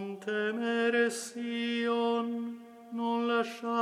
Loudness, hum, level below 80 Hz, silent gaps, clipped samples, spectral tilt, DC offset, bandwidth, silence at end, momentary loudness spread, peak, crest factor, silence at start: -31 LUFS; none; -88 dBFS; none; under 0.1%; -4 dB/octave; under 0.1%; 14 kHz; 0 s; 9 LU; -16 dBFS; 16 dB; 0 s